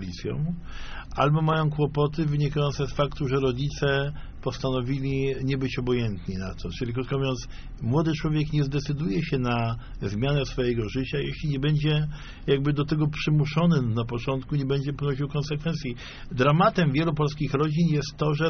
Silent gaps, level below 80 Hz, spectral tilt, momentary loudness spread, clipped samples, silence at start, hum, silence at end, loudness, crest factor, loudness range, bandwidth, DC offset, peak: none; -40 dBFS; -6 dB/octave; 10 LU; under 0.1%; 0 s; none; 0 s; -26 LUFS; 18 dB; 3 LU; 6.6 kHz; under 0.1%; -8 dBFS